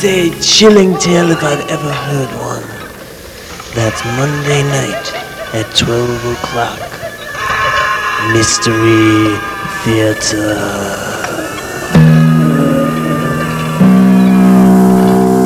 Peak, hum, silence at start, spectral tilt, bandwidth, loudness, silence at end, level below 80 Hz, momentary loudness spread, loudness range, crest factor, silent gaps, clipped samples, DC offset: 0 dBFS; none; 0 s; -5 dB/octave; 15.5 kHz; -11 LUFS; 0 s; -38 dBFS; 14 LU; 7 LU; 10 dB; none; 0.1%; under 0.1%